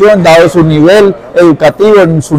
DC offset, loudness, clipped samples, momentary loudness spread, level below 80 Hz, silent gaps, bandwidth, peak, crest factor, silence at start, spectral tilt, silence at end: under 0.1%; -5 LUFS; 6%; 3 LU; -36 dBFS; none; 15.5 kHz; 0 dBFS; 4 dB; 0 s; -6.5 dB/octave; 0 s